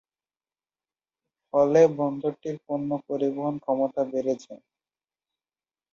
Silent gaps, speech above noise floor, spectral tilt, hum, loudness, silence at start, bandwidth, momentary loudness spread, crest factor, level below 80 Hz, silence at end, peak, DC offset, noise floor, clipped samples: none; over 65 dB; -7.5 dB/octave; none; -25 LUFS; 1.55 s; 7.2 kHz; 11 LU; 22 dB; -70 dBFS; 1.4 s; -6 dBFS; under 0.1%; under -90 dBFS; under 0.1%